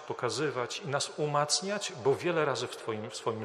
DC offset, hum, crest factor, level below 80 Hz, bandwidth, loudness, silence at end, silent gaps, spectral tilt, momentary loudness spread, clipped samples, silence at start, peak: under 0.1%; none; 18 dB; -78 dBFS; 13 kHz; -31 LUFS; 0 s; none; -3.5 dB/octave; 7 LU; under 0.1%; 0 s; -14 dBFS